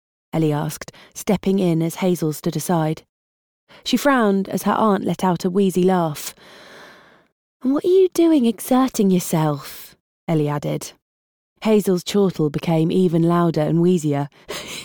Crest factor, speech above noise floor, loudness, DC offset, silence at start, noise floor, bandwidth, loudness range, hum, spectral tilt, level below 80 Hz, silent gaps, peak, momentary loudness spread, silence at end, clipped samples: 14 dB; 29 dB; -19 LUFS; under 0.1%; 0.35 s; -47 dBFS; over 20 kHz; 3 LU; none; -6.5 dB/octave; -56 dBFS; 3.09-3.67 s, 7.32-7.60 s, 10.00-10.27 s, 11.02-11.56 s; -6 dBFS; 13 LU; 0 s; under 0.1%